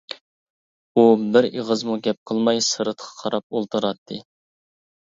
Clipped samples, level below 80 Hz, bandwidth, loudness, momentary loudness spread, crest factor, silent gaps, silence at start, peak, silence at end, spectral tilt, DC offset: under 0.1%; -70 dBFS; 7.8 kHz; -21 LUFS; 18 LU; 20 dB; 0.21-0.95 s, 2.18-2.26 s, 3.43-3.50 s, 3.98-4.06 s; 0.1 s; -2 dBFS; 0.8 s; -4 dB/octave; under 0.1%